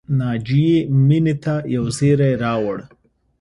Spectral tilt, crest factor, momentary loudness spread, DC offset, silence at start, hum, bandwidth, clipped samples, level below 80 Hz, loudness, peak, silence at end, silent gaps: -7.5 dB/octave; 14 dB; 7 LU; under 0.1%; 0.1 s; none; 11.5 kHz; under 0.1%; -48 dBFS; -18 LUFS; -4 dBFS; 0.55 s; none